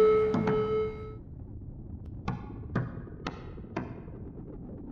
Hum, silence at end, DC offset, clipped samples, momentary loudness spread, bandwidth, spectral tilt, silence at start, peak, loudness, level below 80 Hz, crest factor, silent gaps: none; 0 s; under 0.1%; under 0.1%; 17 LU; 6.8 kHz; -8.5 dB/octave; 0 s; -14 dBFS; -33 LUFS; -48 dBFS; 18 dB; none